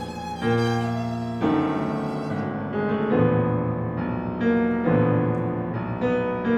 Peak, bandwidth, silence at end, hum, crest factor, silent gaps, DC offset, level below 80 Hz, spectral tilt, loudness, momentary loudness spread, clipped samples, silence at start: -8 dBFS; 10 kHz; 0 s; none; 16 dB; none; under 0.1%; -50 dBFS; -8.5 dB/octave; -24 LUFS; 7 LU; under 0.1%; 0 s